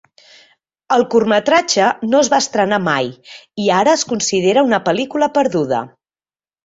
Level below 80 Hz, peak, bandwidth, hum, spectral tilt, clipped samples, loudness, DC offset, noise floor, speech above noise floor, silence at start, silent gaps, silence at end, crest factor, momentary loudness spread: -58 dBFS; -2 dBFS; 8 kHz; none; -3.5 dB/octave; under 0.1%; -15 LUFS; under 0.1%; under -90 dBFS; over 75 dB; 0.9 s; none; 0.8 s; 16 dB; 7 LU